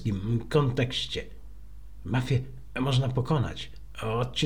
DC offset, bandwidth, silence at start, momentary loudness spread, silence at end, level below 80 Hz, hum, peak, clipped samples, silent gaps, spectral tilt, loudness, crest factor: 0.8%; 11 kHz; 0 s; 13 LU; 0 s; -46 dBFS; none; -10 dBFS; under 0.1%; none; -6 dB/octave; -29 LUFS; 18 dB